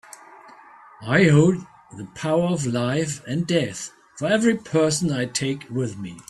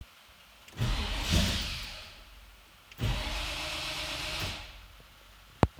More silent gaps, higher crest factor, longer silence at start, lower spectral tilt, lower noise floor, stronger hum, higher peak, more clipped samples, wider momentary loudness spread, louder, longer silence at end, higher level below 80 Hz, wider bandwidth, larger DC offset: neither; second, 18 dB vs 32 dB; first, 0.3 s vs 0 s; first, -5.5 dB/octave vs -4 dB/octave; second, -47 dBFS vs -56 dBFS; neither; about the same, -4 dBFS vs -2 dBFS; neither; second, 17 LU vs 25 LU; first, -22 LUFS vs -33 LUFS; about the same, 0.1 s vs 0 s; second, -56 dBFS vs -40 dBFS; second, 12.5 kHz vs over 20 kHz; neither